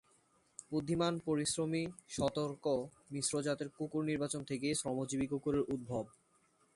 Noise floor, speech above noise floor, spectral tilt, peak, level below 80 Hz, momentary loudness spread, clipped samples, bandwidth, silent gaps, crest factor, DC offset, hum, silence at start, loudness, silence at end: -73 dBFS; 36 dB; -4.5 dB/octave; -20 dBFS; -66 dBFS; 7 LU; under 0.1%; 11.5 kHz; none; 18 dB; under 0.1%; none; 0.6 s; -37 LUFS; 0.65 s